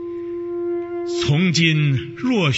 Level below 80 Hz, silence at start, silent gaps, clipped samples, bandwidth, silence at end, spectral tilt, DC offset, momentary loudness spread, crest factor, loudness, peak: -52 dBFS; 0 s; none; under 0.1%; 8 kHz; 0 s; -5.5 dB/octave; under 0.1%; 11 LU; 18 dB; -20 LUFS; -2 dBFS